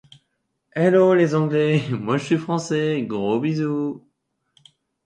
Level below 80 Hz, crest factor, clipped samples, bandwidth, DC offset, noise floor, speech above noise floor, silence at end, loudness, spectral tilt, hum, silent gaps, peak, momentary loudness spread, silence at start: -64 dBFS; 18 dB; under 0.1%; 9.6 kHz; under 0.1%; -74 dBFS; 54 dB; 1.1 s; -20 LUFS; -7 dB/octave; none; none; -4 dBFS; 9 LU; 0.75 s